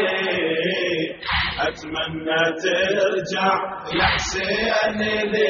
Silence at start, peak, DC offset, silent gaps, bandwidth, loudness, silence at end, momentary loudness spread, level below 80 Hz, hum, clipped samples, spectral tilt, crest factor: 0 s; -6 dBFS; under 0.1%; none; 7.2 kHz; -21 LUFS; 0 s; 6 LU; -42 dBFS; none; under 0.1%; -1.5 dB/octave; 16 dB